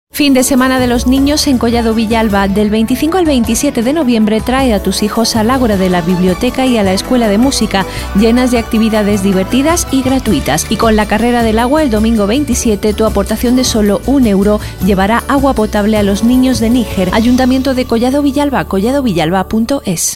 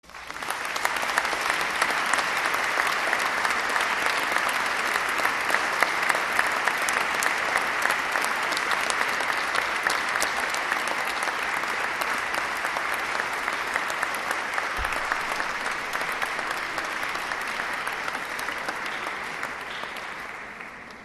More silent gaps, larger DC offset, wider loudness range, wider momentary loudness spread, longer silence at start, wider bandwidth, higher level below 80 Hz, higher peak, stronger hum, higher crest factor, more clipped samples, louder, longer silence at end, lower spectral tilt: neither; first, 0.3% vs under 0.1%; second, 1 LU vs 5 LU; second, 3 LU vs 7 LU; about the same, 0.15 s vs 0.05 s; first, 16.5 kHz vs 13.5 kHz; first, -26 dBFS vs -54 dBFS; about the same, 0 dBFS vs -2 dBFS; neither; second, 10 dB vs 24 dB; neither; first, -11 LUFS vs -25 LUFS; about the same, 0 s vs 0 s; first, -5 dB/octave vs -1 dB/octave